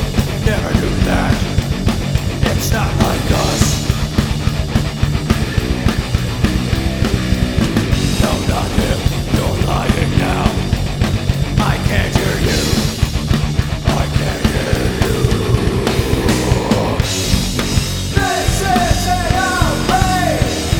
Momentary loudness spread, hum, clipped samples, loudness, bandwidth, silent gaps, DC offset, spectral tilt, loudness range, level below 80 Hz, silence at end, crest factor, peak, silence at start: 3 LU; none; under 0.1%; -16 LUFS; 19.5 kHz; none; under 0.1%; -5 dB/octave; 1 LU; -22 dBFS; 0 s; 16 dB; 0 dBFS; 0 s